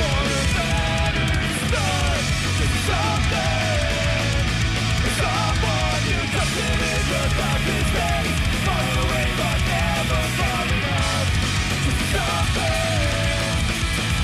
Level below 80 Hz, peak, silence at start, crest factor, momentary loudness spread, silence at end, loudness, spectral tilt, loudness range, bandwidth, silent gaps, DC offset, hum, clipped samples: -28 dBFS; -10 dBFS; 0 s; 10 dB; 1 LU; 0 s; -21 LUFS; -4 dB/octave; 0 LU; 15.5 kHz; none; under 0.1%; none; under 0.1%